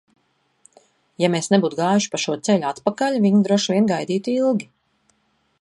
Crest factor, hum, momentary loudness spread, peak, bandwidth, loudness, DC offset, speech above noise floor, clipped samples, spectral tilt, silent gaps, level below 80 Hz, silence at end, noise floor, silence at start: 18 dB; none; 6 LU; -4 dBFS; 11.5 kHz; -20 LUFS; under 0.1%; 47 dB; under 0.1%; -5 dB/octave; none; -68 dBFS; 0.95 s; -66 dBFS; 1.2 s